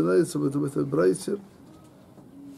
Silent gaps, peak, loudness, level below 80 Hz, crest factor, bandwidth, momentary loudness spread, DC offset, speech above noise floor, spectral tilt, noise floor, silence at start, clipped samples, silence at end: none; -12 dBFS; -26 LUFS; -66 dBFS; 14 dB; 14.5 kHz; 11 LU; under 0.1%; 26 dB; -6.5 dB/octave; -50 dBFS; 0 s; under 0.1%; 0 s